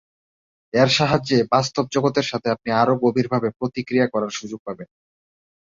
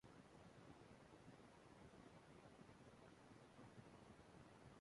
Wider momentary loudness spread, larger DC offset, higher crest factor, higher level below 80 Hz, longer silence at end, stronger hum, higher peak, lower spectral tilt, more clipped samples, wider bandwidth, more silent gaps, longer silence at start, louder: first, 12 LU vs 2 LU; neither; about the same, 18 dB vs 16 dB; first, -56 dBFS vs -80 dBFS; first, 0.85 s vs 0 s; neither; first, -2 dBFS vs -50 dBFS; about the same, -5.5 dB/octave vs -5.5 dB/octave; neither; second, 7.6 kHz vs 11 kHz; first, 4.59-4.66 s vs none; first, 0.75 s vs 0.05 s; first, -20 LUFS vs -66 LUFS